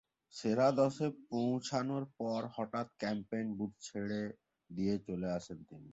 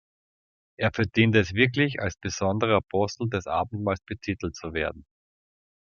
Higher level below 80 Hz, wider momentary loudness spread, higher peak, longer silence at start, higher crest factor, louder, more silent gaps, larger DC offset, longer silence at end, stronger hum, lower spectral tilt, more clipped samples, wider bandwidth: second, -70 dBFS vs -46 dBFS; about the same, 11 LU vs 10 LU; second, -18 dBFS vs -4 dBFS; second, 0.35 s vs 0.8 s; about the same, 20 dB vs 22 dB; second, -37 LUFS vs -26 LUFS; neither; neither; second, 0 s vs 0.9 s; neither; about the same, -6 dB/octave vs -5.5 dB/octave; neither; first, 8 kHz vs 7 kHz